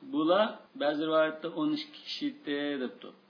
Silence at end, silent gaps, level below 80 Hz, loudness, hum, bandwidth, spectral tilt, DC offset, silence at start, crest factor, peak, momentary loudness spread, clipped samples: 0.2 s; none; under -90 dBFS; -31 LUFS; none; 5.4 kHz; -6 dB/octave; under 0.1%; 0 s; 18 dB; -14 dBFS; 10 LU; under 0.1%